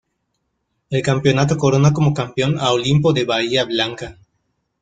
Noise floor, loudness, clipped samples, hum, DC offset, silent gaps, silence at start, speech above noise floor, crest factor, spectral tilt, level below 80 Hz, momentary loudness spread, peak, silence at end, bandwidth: -72 dBFS; -17 LUFS; under 0.1%; none; under 0.1%; none; 0.9 s; 55 dB; 16 dB; -6 dB/octave; -50 dBFS; 8 LU; -2 dBFS; 0.7 s; 9.2 kHz